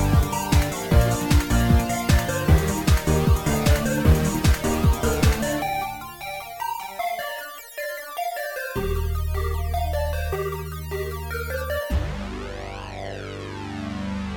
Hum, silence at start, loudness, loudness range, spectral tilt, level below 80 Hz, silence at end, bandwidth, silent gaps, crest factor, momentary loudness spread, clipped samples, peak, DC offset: none; 0 s; -24 LUFS; 9 LU; -5.5 dB/octave; -26 dBFS; 0 s; 18 kHz; none; 18 dB; 13 LU; under 0.1%; -4 dBFS; under 0.1%